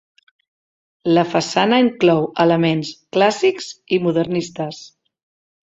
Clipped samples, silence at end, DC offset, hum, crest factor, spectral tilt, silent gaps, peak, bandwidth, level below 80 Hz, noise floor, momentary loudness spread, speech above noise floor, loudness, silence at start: under 0.1%; 0.9 s; under 0.1%; none; 18 dB; -5.5 dB/octave; none; -2 dBFS; 8 kHz; -60 dBFS; under -90 dBFS; 12 LU; over 73 dB; -18 LUFS; 1.05 s